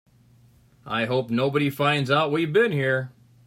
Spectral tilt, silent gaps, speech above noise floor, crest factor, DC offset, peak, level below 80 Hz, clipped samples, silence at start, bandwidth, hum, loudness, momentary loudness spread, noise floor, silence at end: -6.5 dB/octave; none; 34 dB; 18 dB; under 0.1%; -6 dBFS; -64 dBFS; under 0.1%; 0.85 s; 16 kHz; none; -23 LUFS; 7 LU; -56 dBFS; 0.35 s